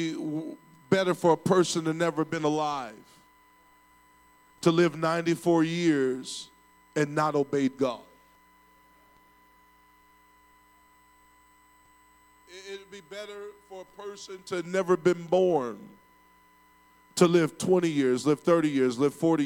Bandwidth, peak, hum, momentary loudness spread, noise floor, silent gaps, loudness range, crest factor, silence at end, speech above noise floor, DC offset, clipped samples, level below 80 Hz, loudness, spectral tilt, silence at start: 17 kHz; -6 dBFS; none; 19 LU; -60 dBFS; none; 17 LU; 22 dB; 0 s; 34 dB; under 0.1%; under 0.1%; -72 dBFS; -26 LUFS; -5.5 dB/octave; 0 s